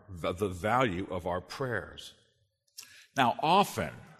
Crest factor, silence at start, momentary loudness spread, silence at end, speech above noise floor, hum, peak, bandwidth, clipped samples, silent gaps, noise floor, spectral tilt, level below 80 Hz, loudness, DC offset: 22 dB; 0.1 s; 23 LU; 0.05 s; 43 dB; none; -10 dBFS; 13.5 kHz; under 0.1%; none; -73 dBFS; -5 dB/octave; -58 dBFS; -30 LUFS; under 0.1%